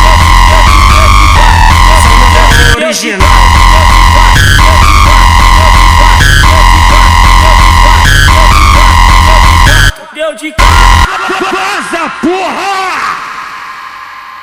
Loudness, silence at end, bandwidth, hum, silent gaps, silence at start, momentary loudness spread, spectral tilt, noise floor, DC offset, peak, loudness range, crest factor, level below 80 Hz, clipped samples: -5 LUFS; 0 s; 16.5 kHz; none; none; 0 s; 10 LU; -3.5 dB/octave; -24 dBFS; 1%; 0 dBFS; 5 LU; 4 dB; -8 dBFS; 20%